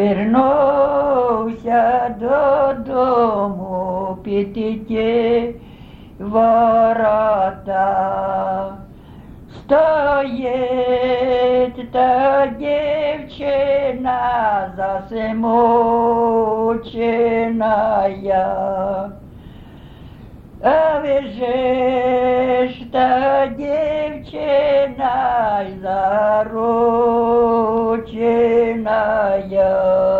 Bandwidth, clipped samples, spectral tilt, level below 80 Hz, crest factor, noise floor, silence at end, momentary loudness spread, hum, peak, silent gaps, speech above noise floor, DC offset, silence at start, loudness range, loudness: 5.2 kHz; under 0.1%; -8 dB/octave; -44 dBFS; 14 dB; -38 dBFS; 0 s; 8 LU; none; -4 dBFS; none; 22 dB; under 0.1%; 0 s; 3 LU; -17 LUFS